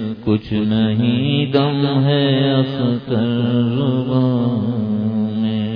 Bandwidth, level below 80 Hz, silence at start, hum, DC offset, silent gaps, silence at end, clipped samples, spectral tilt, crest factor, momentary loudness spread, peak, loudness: 5.2 kHz; -50 dBFS; 0 s; none; under 0.1%; none; 0 s; under 0.1%; -10 dB/octave; 16 dB; 4 LU; -2 dBFS; -17 LUFS